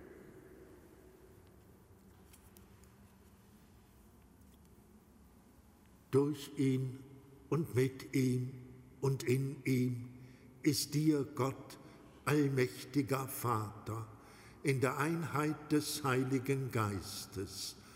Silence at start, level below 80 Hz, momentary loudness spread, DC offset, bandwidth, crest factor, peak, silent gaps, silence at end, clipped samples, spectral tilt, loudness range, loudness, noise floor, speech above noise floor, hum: 0 s; -68 dBFS; 22 LU; under 0.1%; 16 kHz; 20 dB; -18 dBFS; none; 0 s; under 0.1%; -6 dB/octave; 4 LU; -36 LUFS; -63 dBFS; 28 dB; none